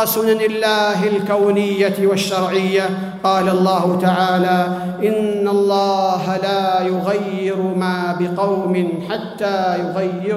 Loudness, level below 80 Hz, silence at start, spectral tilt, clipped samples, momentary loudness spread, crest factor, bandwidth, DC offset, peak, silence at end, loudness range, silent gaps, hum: -17 LUFS; -64 dBFS; 0 s; -5.5 dB/octave; under 0.1%; 5 LU; 14 dB; 16 kHz; under 0.1%; -4 dBFS; 0 s; 3 LU; none; none